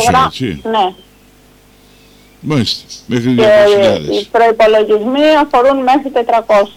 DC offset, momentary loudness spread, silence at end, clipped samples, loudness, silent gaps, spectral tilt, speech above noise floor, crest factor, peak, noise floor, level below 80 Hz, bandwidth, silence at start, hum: under 0.1%; 9 LU; 0.05 s; under 0.1%; -11 LUFS; none; -5 dB/octave; 34 dB; 8 dB; -4 dBFS; -44 dBFS; -44 dBFS; 16 kHz; 0 s; 50 Hz at -45 dBFS